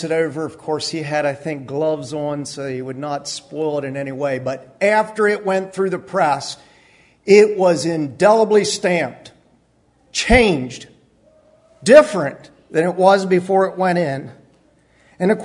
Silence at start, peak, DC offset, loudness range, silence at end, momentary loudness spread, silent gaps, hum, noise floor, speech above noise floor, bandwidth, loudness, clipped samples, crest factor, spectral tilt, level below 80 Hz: 0 s; 0 dBFS; under 0.1%; 7 LU; 0 s; 14 LU; none; none; -58 dBFS; 41 dB; 11 kHz; -18 LUFS; under 0.1%; 18 dB; -5 dB/octave; -40 dBFS